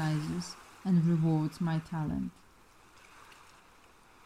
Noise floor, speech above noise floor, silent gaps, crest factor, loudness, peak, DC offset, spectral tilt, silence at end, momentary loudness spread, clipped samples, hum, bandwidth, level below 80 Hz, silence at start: -60 dBFS; 29 dB; none; 14 dB; -32 LUFS; -18 dBFS; under 0.1%; -7.5 dB/octave; 0.9 s; 16 LU; under 0.1%; none; 11.5 kHz; -60 dBFS; 0 s